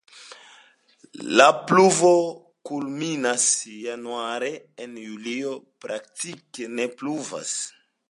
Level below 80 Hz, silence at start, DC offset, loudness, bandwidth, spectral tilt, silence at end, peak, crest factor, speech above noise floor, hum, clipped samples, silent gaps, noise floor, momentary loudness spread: -74 dBFS; 0.15 s; under 0.1%; -23 LUFS; 11.5 kHz; -3 dB/octave; 0.4 s; -2 dBFS; 22 dB; 33 dB; none; under 0.1%; none; -57 dBFS; 21 LU